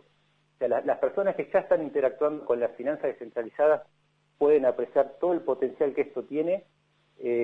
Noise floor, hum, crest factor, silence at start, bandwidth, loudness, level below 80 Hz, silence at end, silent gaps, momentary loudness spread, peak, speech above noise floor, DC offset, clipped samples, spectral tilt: -68 dBFS; none; 16 dB; 0.6 s; 4.1 kHz; -27 LUFS; -72 dBFS; 0 s; none; 8 LU; -10 dBFS; 42 dB; under 0.1%; under 0.1%; -8.5 dB/octave